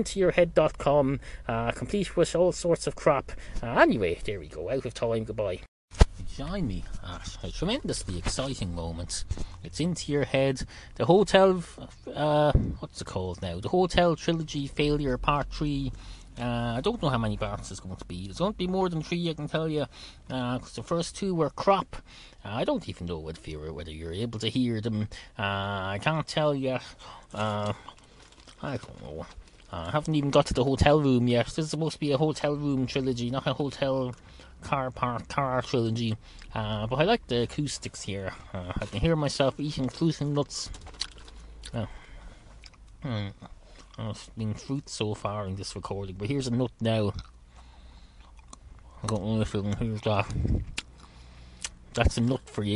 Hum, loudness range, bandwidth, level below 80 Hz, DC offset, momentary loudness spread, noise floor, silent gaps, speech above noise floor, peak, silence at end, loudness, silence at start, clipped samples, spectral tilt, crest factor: none; 8 LU; 11.5 kHz; -40 dBFS; under 0.1%; 15 LU; -53 dBFS; 5.68-5.88 s; 25 dB; -2 dBFS; 0 s; -29 LUFS; 0 s; under 0.1%; -5.5 dB/octave; 26 dB